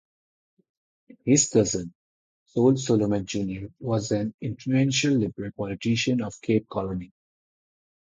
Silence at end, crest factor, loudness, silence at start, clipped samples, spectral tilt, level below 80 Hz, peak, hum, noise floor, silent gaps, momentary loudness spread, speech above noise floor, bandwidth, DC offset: 0.95 s; 20 dB; -25 LUFS; 1.25 s; under 0.1%; -5 dB/octave; -56 dBFS; -6 dBFS; none; under -90 dBFS; 1.95-2.46 s, 4.34-4.38 s; 12 LU; over 66 dB; 9.6 kHz; under 0.1%